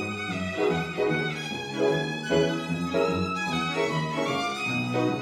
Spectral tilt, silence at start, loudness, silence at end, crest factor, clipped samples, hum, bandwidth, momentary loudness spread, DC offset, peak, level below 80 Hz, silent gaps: -5.5 dB/octave; 0 s; -27 LUFS; 0 s; 16 dB; under 0.1%; none; 15 kHz; 5 LU; under 0.1%; -10 dBFS; -58 dBFS; none